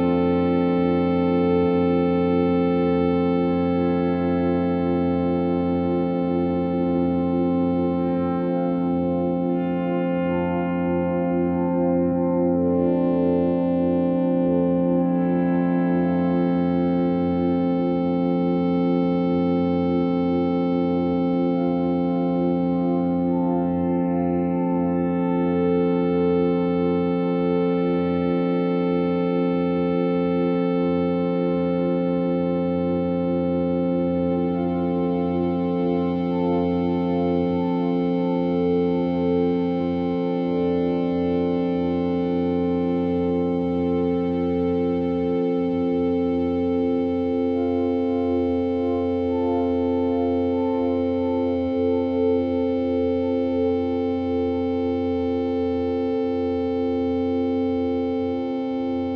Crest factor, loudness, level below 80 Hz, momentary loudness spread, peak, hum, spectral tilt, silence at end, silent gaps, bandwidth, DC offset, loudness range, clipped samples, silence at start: 12 dB; -22 LUFS; -50 dBFS; 3 LU; -8 dBFS; none; -10.5 dB/octave; 0 s; none; 5.2 kHz; under 0.1%; 2 LU; under 0.1%; 0 s